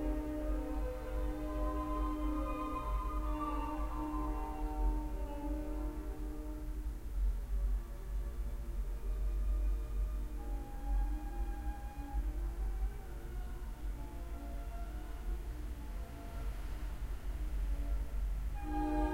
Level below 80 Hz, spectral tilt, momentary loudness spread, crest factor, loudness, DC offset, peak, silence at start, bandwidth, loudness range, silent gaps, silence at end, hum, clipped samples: -38 dBFS; -7.5 dB/octave; 7 LU; 14 dB; -42 LUFS; under 0.1%; -24 dBFS; 0 s; 15.5 kHz; 6 LU; none; 0 s; none; under 0.1%